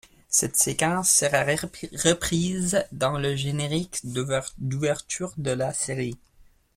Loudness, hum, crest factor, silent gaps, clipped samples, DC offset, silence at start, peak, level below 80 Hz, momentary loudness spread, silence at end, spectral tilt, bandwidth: -24 LUFS; none; 22 dB; none; under 0.1%; under 0.1%; 0.3 s; -4 dBFS; -50 dBFS; 11 LU; 0.35 s; -3.5 dB/octave; 16.5 kHz